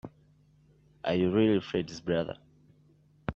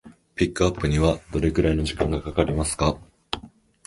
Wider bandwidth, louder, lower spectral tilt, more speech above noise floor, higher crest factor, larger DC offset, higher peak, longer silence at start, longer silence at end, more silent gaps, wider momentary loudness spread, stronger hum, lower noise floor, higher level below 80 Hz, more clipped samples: second, 7.4 kHz vs 11.5 kHz; second, -30 LUFS vs -24 LUFS; first, -7 dB/octave vs -5.5 dB/octave; first, 34 dB vs 23 dB; about the same, 20 dB vs 20 dB; neither; second, -12 dBFS vs -4 dBFS; about the same, 0.05 s vs 0.05 s; second, 0 s vs 0.4 s; neither; first, 17 LU vs 11 LU; neither; first, -63 dBFS vs -46 dBFS; second, -60 dBFS vs -34 dBFS; neither